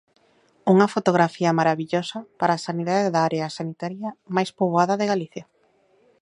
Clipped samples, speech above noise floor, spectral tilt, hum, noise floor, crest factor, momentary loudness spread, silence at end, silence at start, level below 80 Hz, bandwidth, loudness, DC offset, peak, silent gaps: under 0.1%; 40 dB; -6 dB/octave; none; -62 dBFS; 22 dB; 12 LU; 0.8 s; 0.65 s; -70 dBFS; 11 kHz; -22 LUFS; under 0.1%; -2 dBFS; none